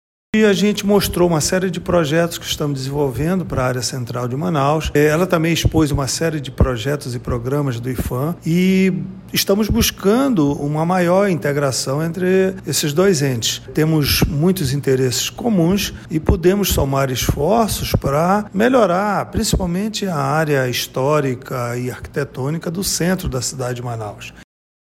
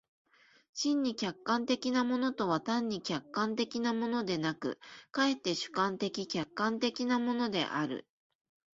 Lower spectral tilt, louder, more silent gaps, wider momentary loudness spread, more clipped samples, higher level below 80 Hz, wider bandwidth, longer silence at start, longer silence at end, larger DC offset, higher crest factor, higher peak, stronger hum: about the same, -5 dB/octave vs -4.5 dB/octave; first, -18 LUFS vs -33 LUFS; neither; about the same, 8 LU vs 6 LU; neither; first, -32 dBFS vs -74 dBFS; first, 16.5 kHz vs 7.8 kHz; second, 0.35 s vs 0.75 s; second, 0.4 s vs 0.7 s; neither; about the same, 14 dB vs 18 dB; first, -2 dBFS vs -16 dBFS; neither